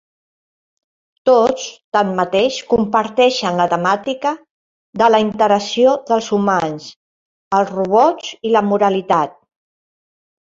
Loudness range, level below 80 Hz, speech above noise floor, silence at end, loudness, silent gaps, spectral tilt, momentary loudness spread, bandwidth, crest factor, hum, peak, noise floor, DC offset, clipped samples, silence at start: 2 LU; -56 dBFS; over 75 dB; 1.25 s; -16 LUFS; 1.84-1.92 s, 4.50-4.93 s, 6.96-7.51 s; -5 dB/octave; 8 LU; 7.6 kHz; 16 dB; none; 0 dBFS; under -90 dBFS; under 0.1%; under 0.1%; 1.25 s